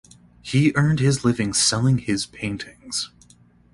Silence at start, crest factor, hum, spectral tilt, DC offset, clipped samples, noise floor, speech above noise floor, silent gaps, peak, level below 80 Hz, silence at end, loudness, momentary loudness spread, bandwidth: 0.45 s; 16 dB; none; -4.5 dB/octave; under 0.1%; under 0.1%; -54 dBFS; 33 dB; none; -6 dBFS; -50 dBFS; 0.65 s; -21 LUFS; 12 LU; 11.5 kHz